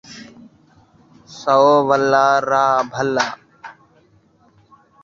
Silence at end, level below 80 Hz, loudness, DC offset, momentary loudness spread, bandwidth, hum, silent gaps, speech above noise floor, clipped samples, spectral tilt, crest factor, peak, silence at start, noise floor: 1.3 s; -62 dBFS; -16 LUFS; under 0.1%; 19 LU; 7.6 kHz; none; none; 40 dB; under 0.1%; -4.5 dB/octave; 18 dB; -2 dBFS; 0.1 s; -55 dBFS